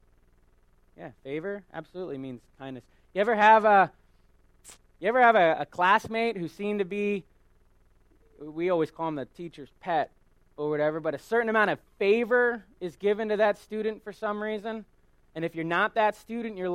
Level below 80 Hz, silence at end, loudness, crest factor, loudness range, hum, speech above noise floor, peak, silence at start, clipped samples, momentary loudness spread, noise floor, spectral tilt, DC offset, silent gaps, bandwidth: -64 dBFS; 0 s; -26 LUFS; 22 dB; 9 LU; none; 35 dB; -6 dBFS; 1 s; under 0.1%; 20 LU; -62 dBFS; -6 dB/octave; under 0.1%; none; 14.5 kHz